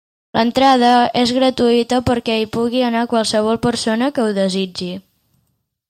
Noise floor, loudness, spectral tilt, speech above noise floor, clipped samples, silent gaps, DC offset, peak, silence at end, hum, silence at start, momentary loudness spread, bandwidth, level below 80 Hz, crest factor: -67 dBFS; -16 LUFS; -4.5 dB/octave; 52 dB; under 0.1%; none; under 0.1%; -2 dBFS; 0.9 s; none; 0.35 s; 9 LU; 15 kHz; -48 dBFS; 16 dB